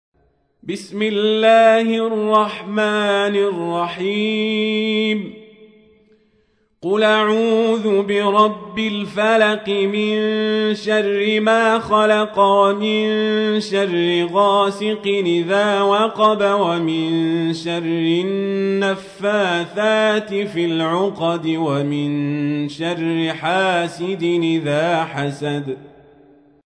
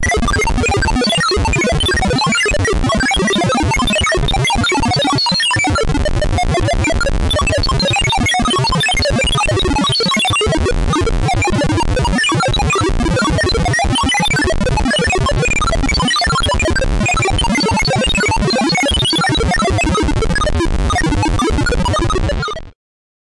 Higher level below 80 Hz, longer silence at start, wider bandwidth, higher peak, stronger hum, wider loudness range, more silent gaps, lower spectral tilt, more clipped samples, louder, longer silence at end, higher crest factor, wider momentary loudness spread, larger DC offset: second, -64 dBFS vs -22 dBFS; first, 0.65 s vs 0 s; about the same, 10.5 kHz vs 11.5 kHz; first, -2 dBFS vs -8 dBFS; neither; first, 4 LU vs 1 LU; neither; first, -5.5 dB/octave vs -4 dB/octave; neither; second, -18 LUFS vs -14 LUFS; first, 0.9 s vs 0.6 s; first, 16 dB vs 6 dB; first, 8 LU vs 3 LU; neither